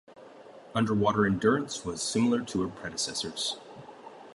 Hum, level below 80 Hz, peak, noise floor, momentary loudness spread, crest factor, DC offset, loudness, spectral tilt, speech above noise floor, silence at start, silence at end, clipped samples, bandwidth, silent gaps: none; -58 dBFS; -12 dBFS; -50 dBFS; 19 LU; 18 dB; under 0.1%; -29 LUFS; -4.5 dB/octave; 22 dB; 0.1 s; 0 s; under 0.1%; 11.5 kHz; none